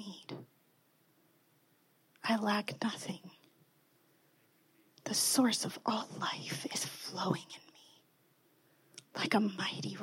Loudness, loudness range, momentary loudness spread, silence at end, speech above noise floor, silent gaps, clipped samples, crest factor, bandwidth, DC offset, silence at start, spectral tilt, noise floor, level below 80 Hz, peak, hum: -35 LUFS; 5 LU; 19 LU; 0 s; 36 dB; none; under 0.1%; 22 dB; 16.5 kHz; under 0.1%; 0 s; -3 dB/octave; -71 dBFS; -88 dBFS; -16 dBFS; none